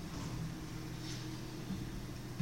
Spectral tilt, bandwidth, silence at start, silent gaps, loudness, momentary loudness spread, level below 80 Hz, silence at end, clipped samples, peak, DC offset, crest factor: -5.5 dB/octave; 16.5 kHz; 0 s; none; -44 LUFS; 3 LU; -52 dBFS; 0 s; under 0.1%; -26 dBFS; 0.1%; 18 dB